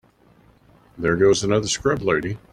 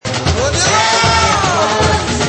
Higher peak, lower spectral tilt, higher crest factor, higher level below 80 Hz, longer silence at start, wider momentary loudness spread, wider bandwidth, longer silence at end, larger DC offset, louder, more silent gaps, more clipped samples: second, -4 dBFS vs 0 dBFS; first, -4.5 dB/octave vs -3 dB/octave; first, 18 dB vs 12 dB; second, -48 dBFS vs -28 dBFS; first, 0.95 s vs 0.05 s; first, 7 LU vs 4 LU; first, 11 kHz vs 8.8 kHz; first, 0.15 s vs 0 s; neither; second, -20 LUFS vs -12 LUFS; neither; neither